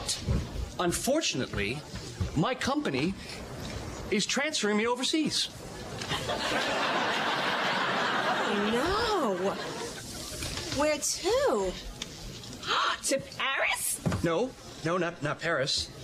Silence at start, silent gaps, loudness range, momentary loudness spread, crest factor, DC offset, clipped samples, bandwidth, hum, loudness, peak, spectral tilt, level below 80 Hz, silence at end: 0 s; none; 3 LU; 11 LU; 14 dB; under 0.1%; under 0.1%; 15.5 kHz; none; -29 LUFS; -18 dBFS; -3.5 dB/octave; -48 dBFS; 0 s